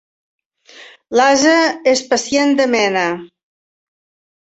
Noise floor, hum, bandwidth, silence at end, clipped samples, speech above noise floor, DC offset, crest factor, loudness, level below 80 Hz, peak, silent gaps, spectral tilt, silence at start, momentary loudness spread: -43 dBFS; none; 8.2 kHz; 1.25 s; under 0.1%; 29 dB; under 0.1%; 16 dB; -14 LUFS; -60 dBFS; -2 dBFS; none; -2.5 dB/octave; 0.8 s; 8 LU